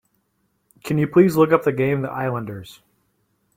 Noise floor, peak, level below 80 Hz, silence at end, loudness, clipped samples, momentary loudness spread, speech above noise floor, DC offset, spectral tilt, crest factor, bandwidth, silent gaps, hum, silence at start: -69 dBFS; -2 dBFS; -58 dBFS; 0.85 s; -19 LUFS; under 0.1%; 18 LU; 50 dB; under 0.1%; -7.5 dB/octave; 20 dB; 16.5 kHz; none; none; 0.85 s